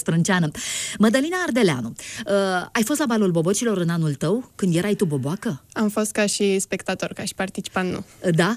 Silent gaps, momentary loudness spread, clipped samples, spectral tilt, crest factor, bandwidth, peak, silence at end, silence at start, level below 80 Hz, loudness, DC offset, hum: none; 8 LU; under 0.1%; -5 dB/octave; 16 dB; 15.5 kHz; -6 dBFS; 0 s; 0 s; -58 dBFS; -22 LUFS; under 0.1%; none